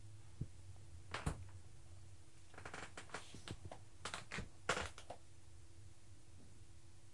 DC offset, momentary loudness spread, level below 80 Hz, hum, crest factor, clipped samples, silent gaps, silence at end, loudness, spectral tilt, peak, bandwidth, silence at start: 0.2%; 19 LU; -62 dBFS; none; 30 dB; under 0.1%; none; 0 s; -50 LUFS; -3.5 dB/octave; -22 dBFS; 11.5 kHz; 0 s